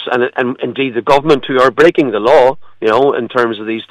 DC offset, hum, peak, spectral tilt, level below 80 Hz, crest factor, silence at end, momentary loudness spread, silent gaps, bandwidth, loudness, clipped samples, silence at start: under 0.1%; none; 0 dBFS; -6 dB/octave; -50 dBFS; 12 dB; 0.05 s; 8 LU; none; 12 kHz; -12 LUFS; under 0.1%; 0 s